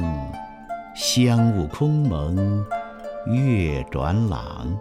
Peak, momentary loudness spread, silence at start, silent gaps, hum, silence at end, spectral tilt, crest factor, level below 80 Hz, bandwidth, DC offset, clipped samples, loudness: -6 dBFS; 16 LU; 0 s; none; none; 0 s; -6 dB/octave; 16 dB; -36 dBFS; 15.5 kHz; under 0.1%; under 0.1%; -22 LUFS